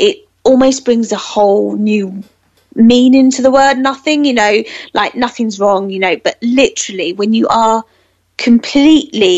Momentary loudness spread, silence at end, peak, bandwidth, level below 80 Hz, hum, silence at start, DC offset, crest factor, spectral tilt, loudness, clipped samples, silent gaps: 8 LU; 0 s; 0 dBFS; 8.2 kHz; -48 dBFS; none; 0 s; under 0.1%; 12 dB; -4 dB/octave; -11 LUFS; under 0.1%; none